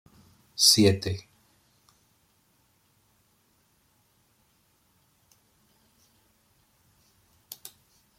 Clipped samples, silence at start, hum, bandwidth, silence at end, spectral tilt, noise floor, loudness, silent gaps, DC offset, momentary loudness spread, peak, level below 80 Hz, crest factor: under 0.1%; 0.6 s; none; 16.5 kHz; 7 s; -3 dB/octave; -68 dBFS; -21 LUFS; none; under 0.1%; 28 LU; -6 dBFS; -66 dBFS; 26 dB